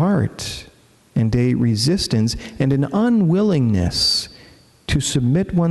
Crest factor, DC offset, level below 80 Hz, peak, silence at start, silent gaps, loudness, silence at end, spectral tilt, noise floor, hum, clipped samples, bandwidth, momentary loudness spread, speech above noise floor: 14 dB; under 0.1%; -38 dBFS; -4 dBFS; 0 s; none; -18 LUFS; 0 s; -5.5 dB/octave; -48 dBFS; none; under 0.1%; 12 kHz; 10 LU; 30 dB